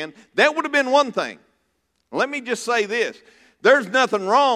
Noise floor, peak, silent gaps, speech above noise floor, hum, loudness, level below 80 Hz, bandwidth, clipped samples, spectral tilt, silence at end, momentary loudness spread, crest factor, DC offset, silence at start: -70 dBFS; -2 dBFS; none; 51 dB; none; -20 LUFS; -76 dBFS; 14 kHz; under 0.1%; -3 dB/octave; 0 s; 10 LU; 18 dB; under 0.1%; 0 s